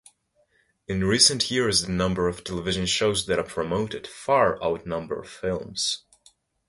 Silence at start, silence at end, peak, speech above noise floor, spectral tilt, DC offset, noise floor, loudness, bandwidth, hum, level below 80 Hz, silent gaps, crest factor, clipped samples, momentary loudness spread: 0.9 s; 0.7 s; -4 dBFS; 42 dB; -3 dB/octave; under 0.1%; -67 dBFS; -24 LUFS; 11.5 kHz; none; -48 dBFS; none; 22 dB; under 0.1%; 13 LU